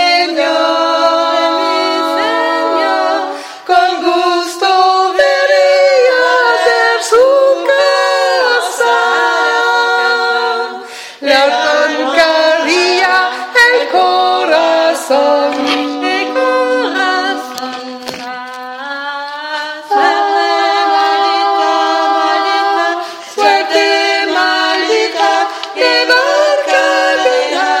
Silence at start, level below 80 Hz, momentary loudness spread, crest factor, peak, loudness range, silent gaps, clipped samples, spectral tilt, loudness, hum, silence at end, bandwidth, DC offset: 0 s; -60 dBFS; 11 LU; 12 dB; 0 dBFS; 5 LU; none; under 0.1%; -0.5 dB/octave; -11 LUFS; none; 0 s; 16.5 kHz; under 0.1%